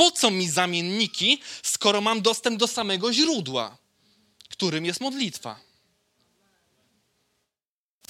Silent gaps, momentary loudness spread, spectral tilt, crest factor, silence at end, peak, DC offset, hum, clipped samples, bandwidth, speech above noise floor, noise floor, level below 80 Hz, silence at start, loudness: none; 9 LU; -2.5 dB/octave; 24 dB; 2.55 s; -2 dBFS; under 0.1%; none; under 0.1%; 16.5 kHz; over 65 dB; under -90 dBFS; -74 dBFS; 0 s; -23 LUFS